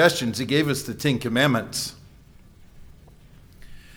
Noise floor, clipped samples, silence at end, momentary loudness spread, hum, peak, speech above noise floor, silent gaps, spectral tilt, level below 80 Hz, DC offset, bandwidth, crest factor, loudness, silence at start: -50 dBFS; under 0.1%; 0 s; 8 LU; none; -6 dBFS; 27 dB; none; -4.5 dB/octave; -50 dBFS; under 0.1%; over 20 kHz; 20 dB; -23 LUFS; 0 s